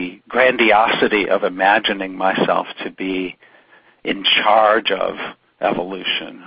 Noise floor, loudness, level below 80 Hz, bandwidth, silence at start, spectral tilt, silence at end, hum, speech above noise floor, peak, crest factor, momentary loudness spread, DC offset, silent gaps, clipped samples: -51 dBFS; -17 LUFS; -54 dBFS; 5.4 kHz; 0 s; -9 dB/octave; 0 s; none; 34 dB; 0 dBFS; 18 dB; 13 LU; under 0.1%; none; under 0.1%